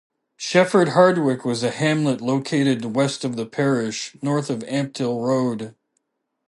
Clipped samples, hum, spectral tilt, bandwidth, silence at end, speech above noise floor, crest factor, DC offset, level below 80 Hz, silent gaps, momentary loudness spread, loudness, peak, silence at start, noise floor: under 0.1%; none; -5.5 dB/octave; 11.5 kHz; 0.8 s; 53 dB; 18 dB; under 0.1%; -68 dBFS; none; 10 LU; -21 LUFS; -2 dBFS; 0.4 s; -73 dBFS